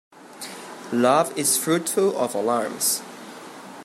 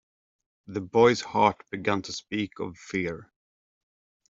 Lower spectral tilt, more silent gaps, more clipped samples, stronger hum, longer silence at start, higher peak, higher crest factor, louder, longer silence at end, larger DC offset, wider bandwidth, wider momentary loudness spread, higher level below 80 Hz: second, -3 dB/octave vs -5 dB/octave; neither; neither; neither; second, 0.15 s vs 0.7 s; about the same, -6 dBFS vs -6 dBFS; about the same, 18 dB vs 22 dB; first, -22 LUFS vs -26 LUFS; second, 0 s vs 1.05 s; neither; first, 16 kHz vs 7.8 kHz; first, 20 LU vs 15 LU; second, -74 dBFS vs -64 dBFS